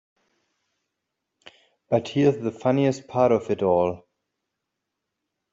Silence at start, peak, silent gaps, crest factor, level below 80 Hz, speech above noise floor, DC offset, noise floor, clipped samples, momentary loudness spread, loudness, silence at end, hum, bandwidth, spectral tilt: 1.9 s; -8 dBFS; none; 18 dB; -64 dBFS; 60 dB; under 0.1%; -82 dBFS; under 0.1%; 5 LU; -23 LUFS; 1.55 s; none; 7.8 kHz; -7.5 dB/octave